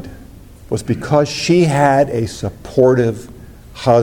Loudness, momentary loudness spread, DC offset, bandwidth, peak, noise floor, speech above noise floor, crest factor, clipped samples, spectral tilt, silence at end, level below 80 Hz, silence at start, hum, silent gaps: -15 LUFS; 12 LU; under 0.1%; 17 kHz; 0 dBFS; -38 dBFS; 24 dB; 14 dB; under 0.1%; -6 dB/octave; 0 s; -42 dBFS; 0 s; none; none